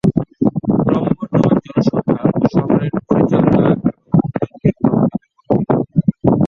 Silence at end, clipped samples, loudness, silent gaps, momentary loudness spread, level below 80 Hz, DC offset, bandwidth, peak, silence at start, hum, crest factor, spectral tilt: 0 s; under 0.1%; -16 LUFS; none; 5 LU; -42 dBFS; under 0.1%; 6.8 kHz; 0 dBFS; 0.05 s; none; 14 dB; -10 dB/octave